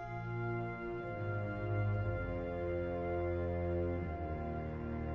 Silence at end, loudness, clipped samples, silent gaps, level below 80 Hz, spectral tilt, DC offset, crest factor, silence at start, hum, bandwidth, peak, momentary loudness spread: 0 s; -39 LUFS; under 0.1%; none; -50 dBFS; -8.5 dB/octave; under 0.1%; 12 dB; 0 s; none; 5.6 kHz; -26 dBFS; 5 LU